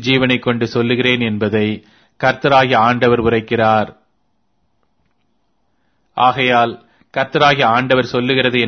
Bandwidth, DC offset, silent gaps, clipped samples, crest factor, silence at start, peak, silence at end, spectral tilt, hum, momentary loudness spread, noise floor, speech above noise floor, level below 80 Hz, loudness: 6.6 kHz; under 0.1%; none; under 0.1%; 16 dB; 0 s; 0 dBFS; 0 s; -6 dB/octave; none; 8 LU; -67 dBFS; 53 dB; -48 dBFS; -14 LUFS